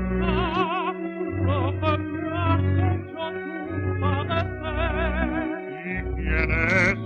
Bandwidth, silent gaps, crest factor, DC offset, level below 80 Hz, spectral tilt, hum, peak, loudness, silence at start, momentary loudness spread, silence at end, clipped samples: 7 kHz; none; 16 dB; under 0.1%; -34 dBFS; -7.5 dB/octave; none; -8 dBFS; -25 LUFS; 0 s; 9 LU; 0 s; under 0.1%